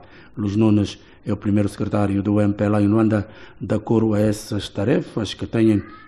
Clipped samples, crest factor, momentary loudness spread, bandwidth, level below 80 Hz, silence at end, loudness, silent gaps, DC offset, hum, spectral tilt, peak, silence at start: under 0.1%; 14 dB; 10 LU; 13 kHz; -48 dBFS; 0.1 s; -20 LUFS; none; 0.2%; none; -7.5 dB/octave; -6 dBFS; 0.35 s